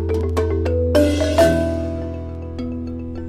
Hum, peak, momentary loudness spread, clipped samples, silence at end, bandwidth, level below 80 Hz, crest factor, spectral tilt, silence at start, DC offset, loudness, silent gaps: none; -2 dBFS; 13 LU; under 0.1%; 0 s; 15 kHz; -30 dBFS; 18 dB; -6.5 dB/octave; 0 s; under 0.1%; -20 LUFS; none